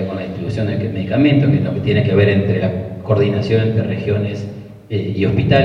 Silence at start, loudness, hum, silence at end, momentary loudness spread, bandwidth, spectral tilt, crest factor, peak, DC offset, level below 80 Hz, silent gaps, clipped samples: 0 s; -17 LUFS; none; 0 s; 10 LU; 6.4 kHz; -9 dB/octave; 16 dB; 0 dBFS; under 0.1%; -44 dBFS; none; under 0.1%